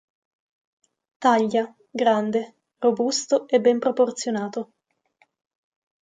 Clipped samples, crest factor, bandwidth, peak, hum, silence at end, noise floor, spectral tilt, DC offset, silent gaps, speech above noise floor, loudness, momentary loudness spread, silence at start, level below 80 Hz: under 0.1%; 18 dB; 9.4 kHz; -6 dBFS; none; 1.4 s; -65 dBFS; -4 dB/octave; under 0.1%; none; 44 dB; -22 LUFS; 12 LU; 1.2 s; -76 dBFS